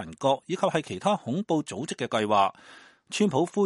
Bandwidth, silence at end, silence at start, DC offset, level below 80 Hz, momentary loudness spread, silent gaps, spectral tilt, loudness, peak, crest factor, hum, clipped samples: 11.5 kHz; 0 s; 0 s; under 0.1%; -68 dBFS; 5 LU; none; -5 dB/octave; -27 LUFS; -10 dBFS; 18 dB; none; under 0.1%